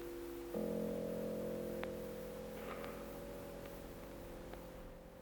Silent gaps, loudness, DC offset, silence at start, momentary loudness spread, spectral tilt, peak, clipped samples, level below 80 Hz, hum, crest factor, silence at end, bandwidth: none; -46 LUFS; under 0.1%; 0 s; 10 LU; -6 dB/octave; -24 dBFS; under 0.1%; -60 dBFS; none; 20 dB; 0 s; over 20 kHz